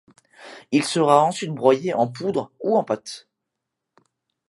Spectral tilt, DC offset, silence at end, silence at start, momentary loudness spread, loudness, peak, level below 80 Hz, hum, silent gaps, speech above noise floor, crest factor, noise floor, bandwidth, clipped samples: -5 dB/octave; under 0.1%; 1.3 s; 0.4 s; 20 LU; -21 LUFS; -2 dBFS; -72 dBFS; none; none; 61 dB; 22 dB; -82 dBFS; 11.5 kHz; under 0.1%